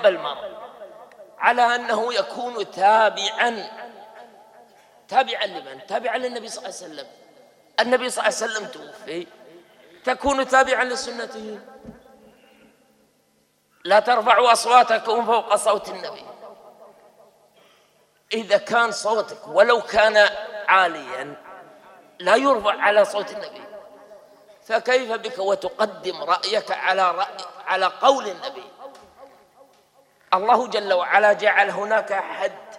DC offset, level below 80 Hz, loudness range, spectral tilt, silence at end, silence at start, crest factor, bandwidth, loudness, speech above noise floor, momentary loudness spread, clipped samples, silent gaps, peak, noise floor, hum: under 0.1%; -60 dBFS; 7 LU; -2 dB/octave; 0 s; 0 s; 20 dB; 14 kHz; -20 LUFS; 43 dB; 19 LU; under 0.1%; none; -2 dBFS; -64 dBFS; none